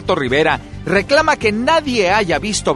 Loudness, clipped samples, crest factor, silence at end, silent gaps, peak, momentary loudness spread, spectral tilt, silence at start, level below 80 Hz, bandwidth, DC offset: -15 LUFS; under 0.1%; 16 dB; 0 s; none; 0 dBFS; 5 LU; -4 dB/octave; 0 s; -38 dBFS; 11.5 kHz; under 0.1%